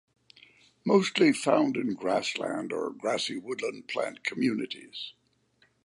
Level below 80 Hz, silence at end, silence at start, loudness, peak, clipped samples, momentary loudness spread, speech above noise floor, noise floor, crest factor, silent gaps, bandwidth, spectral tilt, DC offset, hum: -78 dBFS; 0.75 s; 0.85 s; -29 LUFS; -8 dBFS; under 0.1%; 13 LU; 40 dB; -68 dBFS; 20 dB; none; 11.5 kHz; -4.5 dB/octave; under 0.1%; none